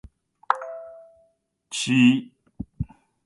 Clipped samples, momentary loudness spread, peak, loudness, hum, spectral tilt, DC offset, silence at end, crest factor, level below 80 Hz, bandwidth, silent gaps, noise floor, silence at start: under 0.1%; 23 LU; -2 dBFS; -23 LUFS; none; -4.5 dB/octave; under 0.1%; 0.4 s; 24 dB; -50 dBFS; 11.5 kHz; none; -67 dBFS; 0.5 s